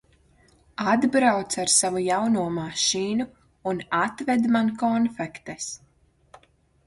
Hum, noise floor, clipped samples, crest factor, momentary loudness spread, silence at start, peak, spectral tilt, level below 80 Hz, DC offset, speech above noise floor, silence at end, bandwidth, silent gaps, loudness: none; -60 dBFS; under 0.1%; 20 dB; 14 LU; 0.8 s; -6 dBFS; -3 dB/octave; -62 dBFS; under 0.1%; 36 dB; 1.1 s; 11.5 kHz; none; -24 LUFS